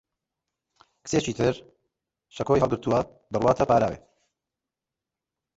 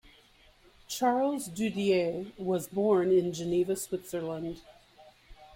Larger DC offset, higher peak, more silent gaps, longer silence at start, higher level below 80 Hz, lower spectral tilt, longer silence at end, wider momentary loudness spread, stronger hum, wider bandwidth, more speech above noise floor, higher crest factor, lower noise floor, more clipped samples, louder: neither; first, -6 dBFS vs -14 dBFS; neither; first, 1.05 s vs 0.9 s; first, -52 dBFS vs -62 dBFS; about the same, -6 dB/octave vs -5.5 dB/octave; first, 1.6 s vs 0.1 s; first, 14 LU vs 10 LU; neither; second, 8 kHz vs 16.5 kHz; first, 64 dB vs 31 dB; about the same, 20 dB vs 16 dB; first, -88 dBFS vs -60 dBFS; neither; first, -25 LUFS vs -30 LUFS